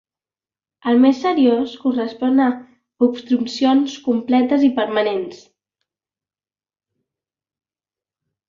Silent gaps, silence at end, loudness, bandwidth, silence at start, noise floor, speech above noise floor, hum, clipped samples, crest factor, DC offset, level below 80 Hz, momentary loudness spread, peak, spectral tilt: none; 3.15 s; -18 LUFS; 7.4 kHz; 0.85 s; under -90 dBFS; over 73 dB; none; under 0.1%; 16 dB; under 0.1%; -66 dBFS; 7 LU; -2 dBFS; -5.5 dB/octave